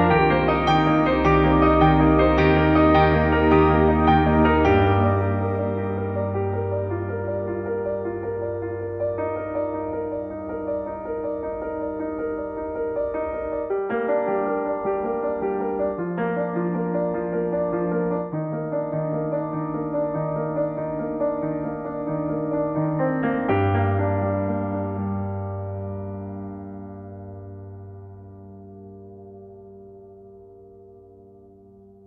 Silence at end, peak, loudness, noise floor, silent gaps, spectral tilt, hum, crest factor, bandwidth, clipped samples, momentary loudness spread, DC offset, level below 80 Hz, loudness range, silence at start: 1.1 s; -6 dBFS; -23 LUFS; -49 dBFS; none; -9 dB/octave; none; 18 dB; 6.2 kHz; under 0.1%; 18 LU; under 0.1%; -36 dBFS; 16 LU; 0 s